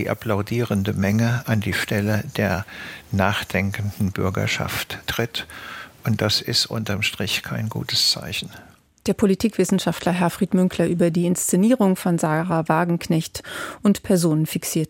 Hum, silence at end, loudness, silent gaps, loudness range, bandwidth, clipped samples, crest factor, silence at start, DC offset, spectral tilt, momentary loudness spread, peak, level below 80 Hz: none; 0.05 s; -21 LUFS; none; 4 LU; 17 kHz; under 0.1%; 20 dB; 0 s; under 0.1%; -5 dB/octave; 9 LU; -2 dBFS; -50 dBFS